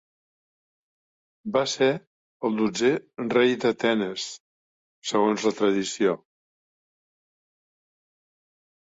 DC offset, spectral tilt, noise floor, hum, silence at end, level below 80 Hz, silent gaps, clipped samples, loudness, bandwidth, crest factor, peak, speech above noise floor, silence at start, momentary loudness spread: under 0.1%; -4 dB/octave; under -90 dBFS; none; 2.65 s; -70 dBFS; 2.07-2.40 s, 4.40-5.02 s; under 0.1%; -25 LUFS; 8 kHz; 18 dB; -8 dBFS; over 66 dB; 1.45 s; 12 LU